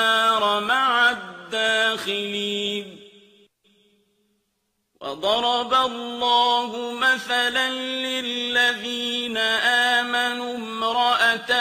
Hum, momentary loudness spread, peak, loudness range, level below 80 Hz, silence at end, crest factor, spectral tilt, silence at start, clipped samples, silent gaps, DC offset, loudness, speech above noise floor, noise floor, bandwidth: none; 9 LU; -6 dBFS; 7 LU; -68 dBFS; 0 s; 16 dB; -1.5 dB/octave; 0 s; under 0.1%; none; under 0.1%; -21 LUFS; 51 dB; -74 dBFS; 15.5 kHz